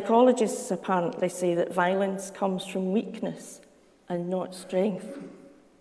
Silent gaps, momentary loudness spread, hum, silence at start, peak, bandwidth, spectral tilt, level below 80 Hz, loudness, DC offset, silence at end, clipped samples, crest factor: none; 14 LU; none; 0 s; -8 dBFS; 11 kHz; -5.5 dB/octave; -74 dBFS; -28 LUFS; under 0.1%; 0.35 s; under 0.1%; 20 dB